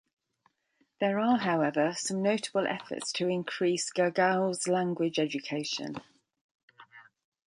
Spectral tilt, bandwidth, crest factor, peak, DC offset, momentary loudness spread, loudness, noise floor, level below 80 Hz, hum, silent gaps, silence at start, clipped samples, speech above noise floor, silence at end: -4.5 dB/octave; 11.5 kHz; 18 dB; -12 dBFS; under 0.1%; 8 LU; -29 LUFS; -74 dBFS; -78 dBFS; none; 6.41-6.68 s; 1 s; under 0.1%; 44 dB; 0.45 s